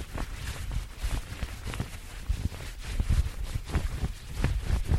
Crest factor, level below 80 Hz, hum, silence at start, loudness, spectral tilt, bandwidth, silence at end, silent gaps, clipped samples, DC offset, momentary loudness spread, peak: 20 dB; -32 dBFS; none; 0 s; -35 LUFS; -5.5 dB/octave; 16 kHz; 0 s; none; under 0.1%; under 0.1%; 8 LU; -10 dBFS